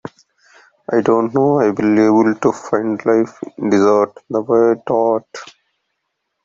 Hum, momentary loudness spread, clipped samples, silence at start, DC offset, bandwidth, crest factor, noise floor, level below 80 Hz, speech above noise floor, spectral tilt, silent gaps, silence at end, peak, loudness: none; 11 LU; under 0.1%; 0.05 s; under 0.1%; 7.6 kHz; 14 dB; -73 dBFS; -60 dBFS; 59 dB; -7 dB/octave; none; 1 s; -2 dBFS; -15 LUFS